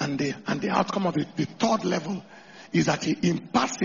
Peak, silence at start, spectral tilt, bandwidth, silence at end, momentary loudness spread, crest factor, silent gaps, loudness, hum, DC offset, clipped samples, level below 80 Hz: -8 dBFS; 0 s; -5 dB/octave; 7.2 kHz; 0 s; 6 LU; 18 dB; none; -26 LUFS; none; under 0.1%; under 0.1%; -60 dBFS